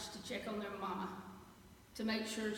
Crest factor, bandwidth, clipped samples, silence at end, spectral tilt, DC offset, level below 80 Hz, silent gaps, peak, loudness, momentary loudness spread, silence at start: 16 dB; 17 kHz; under 0.1%; 0 s; -4 dB/octave; under 0.1%; -68 dBFS; none; -26 dBFS; -42 LUFS; 19 LU; 0 s